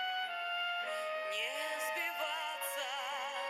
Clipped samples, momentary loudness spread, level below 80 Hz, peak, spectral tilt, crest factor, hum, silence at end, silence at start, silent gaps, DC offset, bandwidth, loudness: under 0.1%; 2 LU; under -90 dBFS; -24 dBFS; 2 dB/octave; 14 dB; none; 0 s; 0 s; none; under 0.1%; 17.5 kHz; -37 LUFS